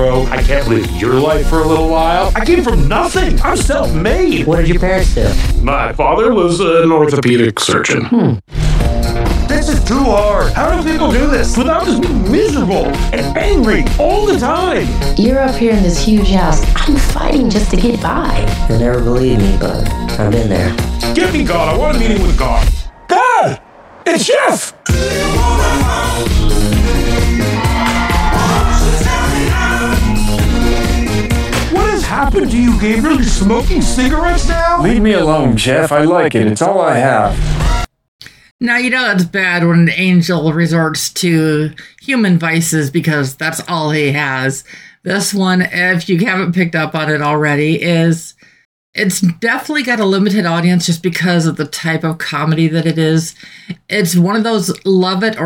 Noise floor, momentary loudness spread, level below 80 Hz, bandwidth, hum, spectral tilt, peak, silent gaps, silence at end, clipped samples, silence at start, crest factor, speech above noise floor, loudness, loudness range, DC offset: -38 dBFS; 5 LU; -18 dBFS; 16.5 kHz; none; -5.5 dB/octave; 0 dBFS; 38.08-38.19 s, 38.51-38.59 s, 48.65-48.93 s; 0 s; under 0.1%; 0 s; 12 dB; 26 dB; -13 LUFS; 3 LU; under 0.1%